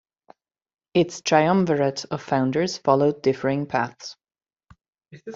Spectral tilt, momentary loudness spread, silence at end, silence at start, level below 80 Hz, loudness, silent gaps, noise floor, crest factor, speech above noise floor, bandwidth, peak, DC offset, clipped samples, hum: -5.5 dB/octave; 11 LU; 0 s; 0.95 s; -62 dBFS; -22 LUFS; 4.88-4.93 s; under -90 dBFS; 20 dB; over 68 dB; 7.8 kHz; -4 dBFS; under 0.1%; under 0.1%; none